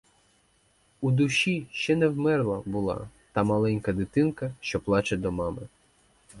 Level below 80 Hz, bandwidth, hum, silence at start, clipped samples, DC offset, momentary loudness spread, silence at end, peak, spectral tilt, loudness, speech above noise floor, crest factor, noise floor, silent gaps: -52 dBFS; 11.5 kHz; none; 1 s; under 0.1%; under 0.1%; 9 LU; 0 s; -10 dBFS; -6 dB/octave; -27 LUFS; 39 dB; 18 dB; -65 dBFS; none